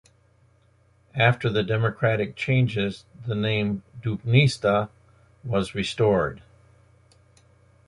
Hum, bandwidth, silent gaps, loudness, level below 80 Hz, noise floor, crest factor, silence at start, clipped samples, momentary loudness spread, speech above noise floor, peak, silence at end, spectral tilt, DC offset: none; 11 kHz; none; -24 LUFS; -52 dBFS; -60 dBFS; 20 dB; 1.15 s; under 0.1%; 11 LU; 37 dB; -4 dBFS; 1.5 s; -6.5 dB/octave; under 0.1%